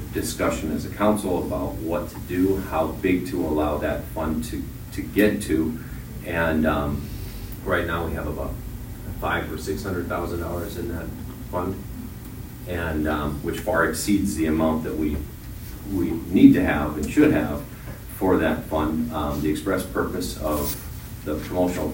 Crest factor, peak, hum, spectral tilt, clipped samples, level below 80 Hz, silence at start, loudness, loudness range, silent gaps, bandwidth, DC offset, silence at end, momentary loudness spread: 24 dB; 0 dBFS; none; -6 dB/octave; under 0.1%; -36 dBFS; 0 s; -24 LUFS; 8 LU; none; 16.5 kHz; under 0.1%; 0 s; 14 LU